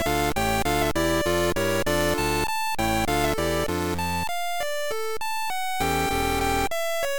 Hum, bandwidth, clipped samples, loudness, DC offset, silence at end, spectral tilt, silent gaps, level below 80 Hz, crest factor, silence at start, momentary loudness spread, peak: none; 19 kHz; under 0.1%; -25 LUFS; under 0.1%; 0 s; -4 dB/octave; none; -38 dBFS; 16 dB; 0 s; 5 LU; -10 dBFS